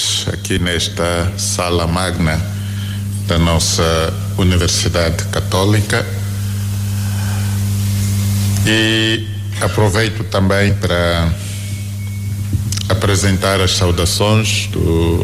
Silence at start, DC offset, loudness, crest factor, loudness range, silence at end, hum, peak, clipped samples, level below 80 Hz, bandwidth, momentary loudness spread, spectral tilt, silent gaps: 0 s; under 0.1%; -16 LUFS; 10 dB; 2 LU; 0 s; none; -6 dBFS; under 0.1%; -30 dBFS; 16 kHz; 8 LU; -4.5 dB/octave; none